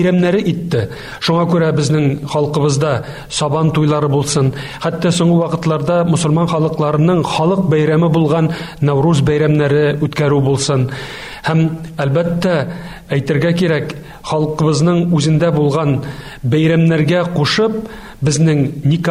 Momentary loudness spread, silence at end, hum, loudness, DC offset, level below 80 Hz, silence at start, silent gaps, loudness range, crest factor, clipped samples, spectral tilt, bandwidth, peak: 8 LU; 0 s; none; -15 LUFS; under 0.1%; -42 dBFS; 0 s; none; 3 LU; 10 dB; under 0.1%; -6.5 dB/octave; 12 kHz; -4 dBFS